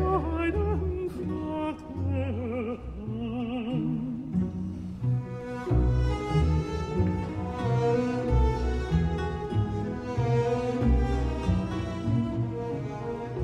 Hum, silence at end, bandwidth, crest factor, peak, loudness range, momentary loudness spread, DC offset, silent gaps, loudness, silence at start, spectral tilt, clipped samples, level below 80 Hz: none; 0 s; 9.2 kHz; 14 dB; -14 dBFS; 4 LU; 8 LU; under 0.1%; none; -29 LUFS; 0 s; -8.5 dB/octave; under 0.1%; -34 dBFS